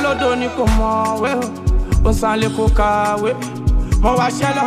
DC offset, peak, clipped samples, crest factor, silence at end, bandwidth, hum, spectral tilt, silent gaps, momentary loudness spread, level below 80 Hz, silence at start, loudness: under 0.1%; -2 dBFS; under 0.1%; 14 dB; 0 s; 14.5 kHz; none; -6 dB/octave; none; 4 LU; -20 dBFS; 0 s; -17 LUFS